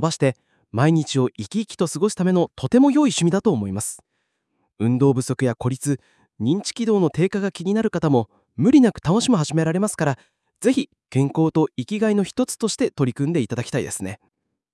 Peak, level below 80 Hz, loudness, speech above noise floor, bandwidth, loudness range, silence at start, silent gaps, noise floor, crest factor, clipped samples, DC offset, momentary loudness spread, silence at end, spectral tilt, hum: -4 dBFS; -58 dBFS; -21 LUFS; 53 dB; 12 kHz; 3 LU; 0 s; none; -73 dBFS; 16 dB; under 0.1%; under 0.1%; 10 LU; 0.6 s; -6 dB/octave; none